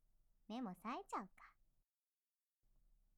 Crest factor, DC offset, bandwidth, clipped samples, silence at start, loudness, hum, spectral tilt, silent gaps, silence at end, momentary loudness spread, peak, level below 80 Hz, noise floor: 20 dB; under 0.1%; 14.5 kHz; under 0.1%; 0.5 s; -50 LUFS; none; -5.5 dB/octave; none; 1.65 s; 18 LU; -34 dBFS; -78 dBFS; under -90 dBFS